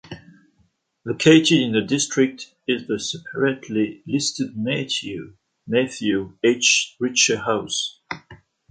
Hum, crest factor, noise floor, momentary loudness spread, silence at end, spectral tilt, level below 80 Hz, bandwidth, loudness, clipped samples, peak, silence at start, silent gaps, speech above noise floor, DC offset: none; 20 dB; -65 dBFS; 17 LU; 0.35 s; -3.5 dB/octave; -60 dBFS; 9.4 kHz; -20 LUFS; under 0.1%; -2 dBFS; 0.1 s; none; 44 dB; under 0.1%